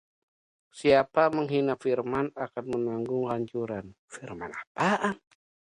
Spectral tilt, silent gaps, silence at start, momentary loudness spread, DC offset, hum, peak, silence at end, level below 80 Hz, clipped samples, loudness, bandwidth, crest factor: -6 dB/octave; 3.99-4.08 s, 4.67-4.75 s; 0.75 s; 16 LU; under 0.1%; none; -8 dBFS; 0.6 s; -64 dBFS; under 0.1%; -28 LUFS; 11 kHz; 20 dB